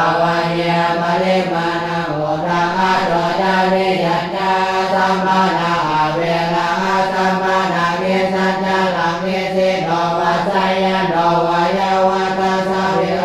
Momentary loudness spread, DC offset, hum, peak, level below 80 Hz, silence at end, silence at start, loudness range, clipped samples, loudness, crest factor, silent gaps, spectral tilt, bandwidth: 3 LU; under 0.1%; none; -2 dBFS; -48 dBFS; 0 s; 0 s; 1 LU; under 0.1%; -16 LUFS; 12 dB; none; -5.5 dB/octave; 13.5 kHz